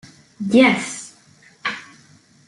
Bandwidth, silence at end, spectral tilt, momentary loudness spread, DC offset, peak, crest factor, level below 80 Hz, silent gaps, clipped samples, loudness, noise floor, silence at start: 11.5 kHz; 0.65 s; -4 dB/octave; 20 LU; under 0.1%; -2 dBFS; 20 dB; -66 dBFS; none; under 0.1%; -19 LUFS; -52 dBFS; 0.4 s